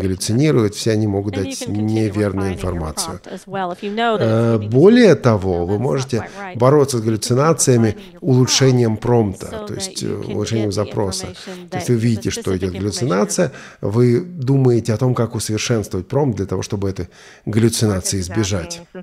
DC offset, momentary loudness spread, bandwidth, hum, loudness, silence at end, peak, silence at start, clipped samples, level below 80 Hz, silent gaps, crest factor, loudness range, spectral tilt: under 0.1%; 11 LU; 15.5 kHz; none; -17 LUFS; 0 s; 0 dBFS; 0 s; under 0.1%; -44 dBFS; none; 18 dB; 6 LU; -5.5 dB/octave